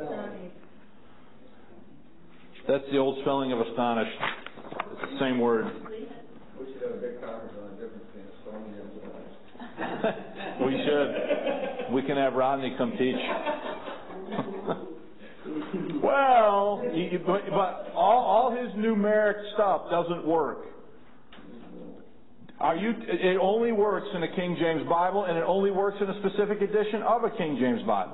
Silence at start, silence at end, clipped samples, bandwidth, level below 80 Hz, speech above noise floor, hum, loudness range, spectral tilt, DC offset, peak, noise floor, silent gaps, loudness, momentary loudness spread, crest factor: 0 s; 0 s; under 0.1%; 4.1 kHz; -66 dBFS; 29 dB; none; 9 LU; -10 dB/octave; 0.6%; -10 dBFS; -55 dBFS; none; -27 LUFS; 20 LU; 18 dB